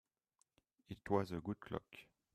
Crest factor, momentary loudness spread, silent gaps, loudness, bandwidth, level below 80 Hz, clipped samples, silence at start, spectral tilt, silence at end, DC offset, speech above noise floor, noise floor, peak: 24 dB; 19 LU; none; -43 LUFS; 14 kHz; -72 dBFS; under 0.1%; 0.9 s; -7.5 dB/octave; 0.3 s; under 0.1%; 40 dB; -83 dBFS; -22 dBFS